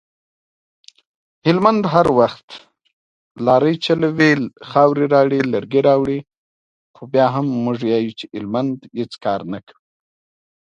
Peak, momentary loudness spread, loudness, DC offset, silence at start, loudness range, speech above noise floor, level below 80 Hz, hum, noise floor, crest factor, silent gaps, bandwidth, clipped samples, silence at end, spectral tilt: 0 dBFS; 11 LU; -17 LUFS; under 0.1%; 1.45 s; 5 LU; over 73 dB; -56 dBFS; none; under -90 dBFS; 18 dB; 2.43-2.48 s, 2.93-3.35 s, 6.37-6.94 s; 10 kHz; under 0.1%; 1 s; -7 dB/octave